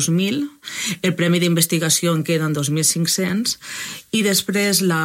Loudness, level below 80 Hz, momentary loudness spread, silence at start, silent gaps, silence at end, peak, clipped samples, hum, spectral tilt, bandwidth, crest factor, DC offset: -19 LUFS; -64 dBFS; 9 LU; 0 s; none; 0 s; -2 dBFS; under 0.1%; none; -3.5 dB/octave; 16.5 kHz; 16 dB; under 0.1%